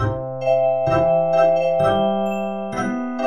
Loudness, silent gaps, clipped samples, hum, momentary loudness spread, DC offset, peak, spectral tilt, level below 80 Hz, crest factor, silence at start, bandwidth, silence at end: -19 LUFS; none; under 0.1%; none; 8 LU; 0.9%; -6 dBFS; -7 dB/octave; -46 dBFS; 14 dB; 0 s; 9.8 kHz; 0 s